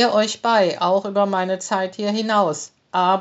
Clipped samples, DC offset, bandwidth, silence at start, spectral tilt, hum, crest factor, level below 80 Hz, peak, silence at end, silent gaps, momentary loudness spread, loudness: under 0.1%; under 0.1%; 8 kHz; 0 s; -3 dB/octave; none; 16 dB; -78 dBFS; -4 dBFS; 0 s; none; 5 LU; -20 LUFS